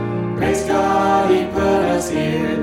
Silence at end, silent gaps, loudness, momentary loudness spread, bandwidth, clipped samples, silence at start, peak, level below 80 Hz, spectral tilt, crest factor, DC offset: 0 s; none; -17 LUFS; 4 LU; 16.5 kHz; under 0.1%; 0 s; -4 dBFS; -40 dBFS; -5.5 dB/octave; 14 dB; under 0.1%